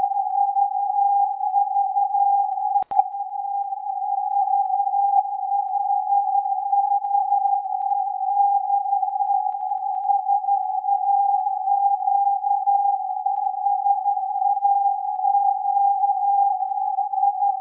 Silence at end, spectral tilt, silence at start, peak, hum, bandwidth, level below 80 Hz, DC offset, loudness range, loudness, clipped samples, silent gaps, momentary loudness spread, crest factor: 0 s; -6 dB/octave; 0 s; -4 dBFS; none; 1.3 kHz; -80 dBFS; under 0.1%; 2 LU; -21 LUFS; under 0.1%; none; 5 LU; 16 dB